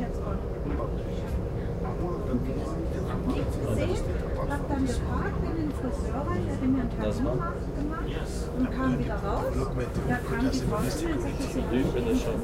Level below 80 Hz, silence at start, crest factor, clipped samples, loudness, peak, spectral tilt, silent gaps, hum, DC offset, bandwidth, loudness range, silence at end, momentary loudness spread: -34 dBFS; 0 s; 14 dB; under 0.1%; -30 LUFS; -14 dBFS; -7 dB/octave; none; none; under 0.1%; 16 kHz; 2 LU; 0 s; 5 LU